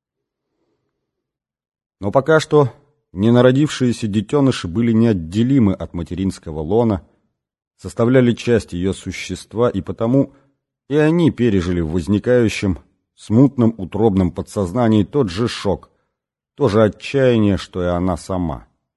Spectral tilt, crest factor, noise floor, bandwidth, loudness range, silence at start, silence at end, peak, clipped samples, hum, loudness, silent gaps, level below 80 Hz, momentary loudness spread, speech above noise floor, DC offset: -7 dB/octave; 18 dB; -82 dBFS; 12 kHz; 3 LU; 2 s; 0.35 s; 0 dBFS; under 0.1%; none; -17 LUFS; 7.67-7.71 s; -38 dBFS; 11 LU; 66 dB; under 0.1%